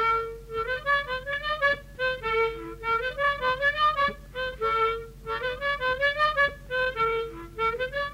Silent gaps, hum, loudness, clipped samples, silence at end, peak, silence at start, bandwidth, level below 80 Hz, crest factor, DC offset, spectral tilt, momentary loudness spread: none; none; -27 LUFS; under 0.1%; 0 s; -14 dBFS; 0 s; 16 kHz; -46 dBFS; 14 dB; under 0.1%; -4 dB/octave; 9 LU